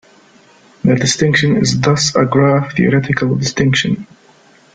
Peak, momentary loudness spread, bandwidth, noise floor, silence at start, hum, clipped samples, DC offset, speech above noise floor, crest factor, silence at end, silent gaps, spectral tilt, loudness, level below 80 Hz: 0 dBFS; 4 LU; 9.2 kHz; -47 dBFS; 0.85 s; none; under 0.1%; under 0.1%; 34 dB; 14 dB; 0.7 s; none; -5 dB/octave; -14 LUFS; -46 dBFS